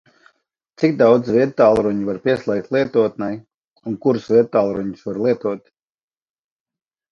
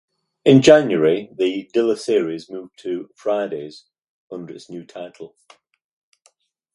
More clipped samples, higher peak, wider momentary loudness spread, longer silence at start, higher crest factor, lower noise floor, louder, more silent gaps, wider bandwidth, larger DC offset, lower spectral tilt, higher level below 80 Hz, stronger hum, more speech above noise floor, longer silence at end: neither; about the same, 0 dBFS vs 0 dBFS; second, 13 LU vs 23 LU; first, 0.8 s vs 0.45 s; about the same, 18 dB vs 20 dB; first, -65 dBFS vs -61 dBFS; about the same, -18 LUFS vs -18 LUFS; about the same, 3.54-3.61 s, 3.67-3.74 s vs 4.09-4.28 s; second, 7.2 kHz vs 11.5 kHz; neither; first, -8 dB/octave vs -6 dB/octave; first, -56 dBFS vs -64 dBFS; neither; first, 48 dB vs 43 dB; about the same, 1.55 s vs 1.5 s